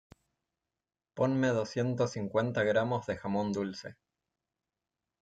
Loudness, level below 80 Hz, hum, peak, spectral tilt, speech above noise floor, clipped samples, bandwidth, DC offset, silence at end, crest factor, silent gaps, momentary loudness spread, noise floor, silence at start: -32 LUFS; -68 dBFS; none; -16 dBFS; -6.5 dB/octave; over 59 dB; under 0.1%; 9.2 kHz; under 0.1%; 1.3 s; 18 dB; none; 10 LU; under -90 dBFS; 1.15 s